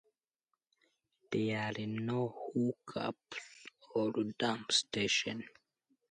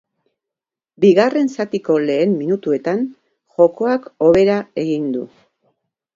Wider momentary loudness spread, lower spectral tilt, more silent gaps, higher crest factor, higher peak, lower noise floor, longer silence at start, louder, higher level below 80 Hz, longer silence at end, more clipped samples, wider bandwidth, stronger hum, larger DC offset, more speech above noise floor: first, 14 LU vs 11 LU; second, -4 dB/octave vs -7 dB/octave; neither; about the same, 20 dB vs 18 dB; second, -18 dBFS vs 0 dBFS; about the same, -88 dBFS vs -87 dBFS; first, 1.3 s vs 1 s; second, -35 LUFS vs -17 LUFS; second, -74 dBFS vs -54 dBFS; second, 0.65 s vs 0.9 s; neither; first, 11 kHz vs 7.6 kHz; neither; neither; second, 52 dB vs 71 dB